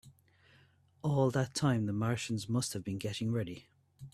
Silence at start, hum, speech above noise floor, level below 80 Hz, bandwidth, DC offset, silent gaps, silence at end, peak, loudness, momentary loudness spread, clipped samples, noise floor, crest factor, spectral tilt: 0.05 s; none; 33 dB; -66 dBFS; 14 kHz; under 0.1%; none; 0.05 s; -16 dBFS; -34 LUFS; 9 LU; under 0.1%; -66 dBFS; 18 dB; -5.5 dB/octave